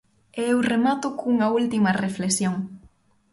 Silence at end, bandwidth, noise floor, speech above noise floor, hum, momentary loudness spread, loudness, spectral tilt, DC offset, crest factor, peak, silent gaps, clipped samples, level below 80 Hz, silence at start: 0.45 s; 11.5 kHz; -57 dBFS; 35 dB; none; 9 LU; -23 LUFS; -5 dB/octave; under 0.1%; 14 dB; -10 dBFS; none; under 0.1%; -60 dBFS; 0.35 s